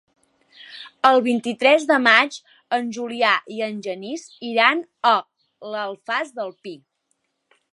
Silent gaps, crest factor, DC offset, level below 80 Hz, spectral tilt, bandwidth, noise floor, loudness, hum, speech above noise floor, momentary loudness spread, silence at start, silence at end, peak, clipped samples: none; 22 dB; under 0.1%; -76 dBFS; -3 dB/octave; 11.5 kHz; -72 dBFS; -20 LUFS; none; 52 dB; 22 LU; 0.7 s; 1 s; 0 dBFS; under 0.1%